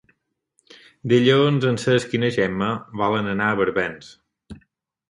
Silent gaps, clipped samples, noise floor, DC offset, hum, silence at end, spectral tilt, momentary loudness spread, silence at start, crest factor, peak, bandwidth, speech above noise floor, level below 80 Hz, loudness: none; under 0.1%; -69 dBFS; under 0.1%; none; 0.55 s; -6 dB/octave; 9 LU; 1.05 s; 18 dB; -4 dBFS; 11.5 kHz; 48 dB; -56 dBFS; -20 LUFS